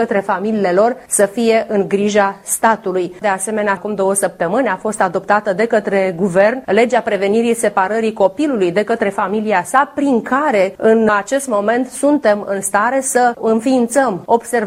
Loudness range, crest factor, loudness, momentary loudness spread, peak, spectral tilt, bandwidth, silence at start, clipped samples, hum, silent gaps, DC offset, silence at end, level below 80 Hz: 2 LU; 14 dB; -15 LUFS; 4 LU; 0 dBFS; -4.5 dB/octave; 16 kHz; 0 s; under 0.1%; none; none; under 0.1%; 0 s; -56 dBFS